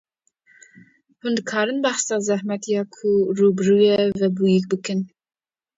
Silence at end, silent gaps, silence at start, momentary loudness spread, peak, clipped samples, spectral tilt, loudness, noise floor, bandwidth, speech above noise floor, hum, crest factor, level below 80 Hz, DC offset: 0.7 s; none; 1.25 s; 9 LU; -6 dBFS; under 0.1%; -5 dB/octave; -20 LUFS; -60 dBFS; 7.8 kHz; 41 dB; none; 16 dB; -64 dBFS; under 0.1%